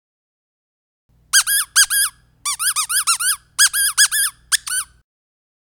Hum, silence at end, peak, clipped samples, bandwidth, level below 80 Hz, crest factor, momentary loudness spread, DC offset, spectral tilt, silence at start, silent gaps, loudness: 60 Hz at -60 dBFS; 0.95 s; 0 dBFS; under 0.1%; over 20 kHz; -58 dBFS; 20 dB; 10 LU; under 0.1%; 5.5 dB/octave; 1.35 s; none; -15 LUFS